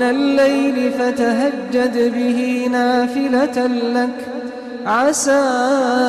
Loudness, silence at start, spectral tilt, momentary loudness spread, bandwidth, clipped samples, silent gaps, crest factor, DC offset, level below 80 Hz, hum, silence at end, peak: -17 LUFS; 0 s; -3.5 dB/octave; 6 LU; 13.5 kHz; under 0.1%; none; 10 dB; under 0.1%; -58 dBFS; none; 0 s; -6 dBFS